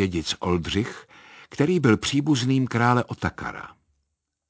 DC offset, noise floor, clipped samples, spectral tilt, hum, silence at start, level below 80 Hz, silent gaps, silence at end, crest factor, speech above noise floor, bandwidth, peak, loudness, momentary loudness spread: under 0.1%; -78 dBFS; under 0.1%; -5.5 dB/octave; none; 0 s; -46 dBFS; none; 0.8 s; 20 dB; 55 dB; 8 kHz; -4 dBFS; -23 LUFS; 17 LU